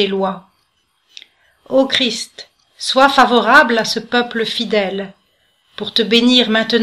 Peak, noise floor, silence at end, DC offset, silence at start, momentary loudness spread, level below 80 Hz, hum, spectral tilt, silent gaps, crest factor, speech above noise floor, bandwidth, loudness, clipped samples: 0 dBFS; -63 dBFS; 0 s; under 0.1%; 0 s; 15 LU; -56 dBFS; none; -3.5 dB/octave; none; 16 dB; 48 dB; 14 kHz; -14 LUFS; 0.1%